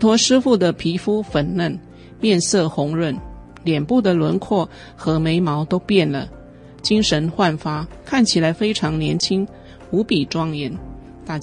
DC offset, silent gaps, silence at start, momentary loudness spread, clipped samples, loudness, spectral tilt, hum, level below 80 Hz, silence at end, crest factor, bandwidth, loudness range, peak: under 0.1%; none; 0 s; 12 LU; under 0.1%; -19 LUFS; -5 dB/octave; none; -44 dBFS; 0 s; 16 dB; 10.5 kHz; 1 LU; -2 dBFS